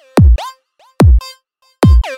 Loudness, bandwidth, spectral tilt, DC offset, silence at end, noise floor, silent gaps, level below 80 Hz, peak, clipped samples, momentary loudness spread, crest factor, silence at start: -12 LUFS; 12.5 kHz; -7.5 dB/octave; under 0.1%; 0 s; -51 dBFS; none; -14 dBFS; -2 dBFS; under 0.1%; 15 LU; 10 dB; 0.15 s